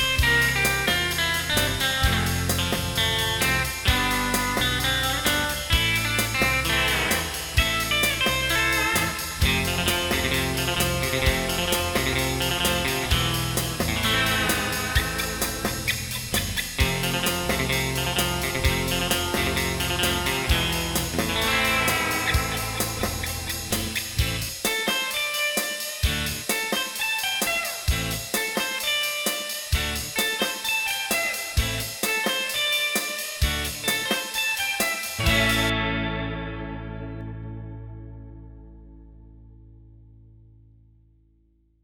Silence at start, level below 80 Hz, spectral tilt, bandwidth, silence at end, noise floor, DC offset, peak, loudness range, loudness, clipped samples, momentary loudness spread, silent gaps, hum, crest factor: 0 s; -34 dBFS; -3 dB/octave; 17.5 kHz; 1.8 s; -62 dBFS; under 0.1%; -6 dBFS; 3 LU; -23 LUFS; under 0.1%; 6 LU; none; none; 20 dB